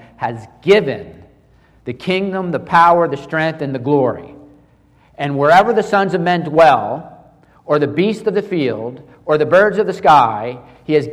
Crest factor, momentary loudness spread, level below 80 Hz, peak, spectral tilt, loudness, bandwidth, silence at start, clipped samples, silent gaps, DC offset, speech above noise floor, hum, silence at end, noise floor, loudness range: 14 dB; 15 LU; -52 dBFS; 0 dBFS; -6.5 dB/octave; -15 LUFS; 12.5 kHz; 0.2 s; under 0.1%; none; under 0.1%; 36 dB; none; 0 s; -51 dBFS; 2 LU